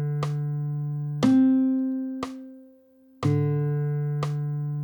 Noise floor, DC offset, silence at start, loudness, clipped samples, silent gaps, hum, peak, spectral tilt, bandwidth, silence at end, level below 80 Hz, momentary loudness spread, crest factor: -55 dBFS; under 0.1%; 0 s; -25 LUFS; under 0.1%; none; none; -10 dBFS; -8.5 dB/octave; 19 kHz; 0 s; -64 dBFS; 13 LU; 14 dB